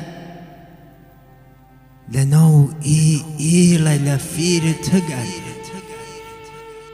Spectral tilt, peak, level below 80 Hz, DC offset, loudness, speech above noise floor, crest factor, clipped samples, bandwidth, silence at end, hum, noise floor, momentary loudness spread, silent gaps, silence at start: -5.5 dB/octave; -4 dBFS; -48 dBFS; under 0.1%; -16 LUFS; 31 dB; 16 dB; under 0.1%; 15 kHz; 0 s; 50 Hz at -40 dBFS; -47 dBFS; 23 LU; none; 0 s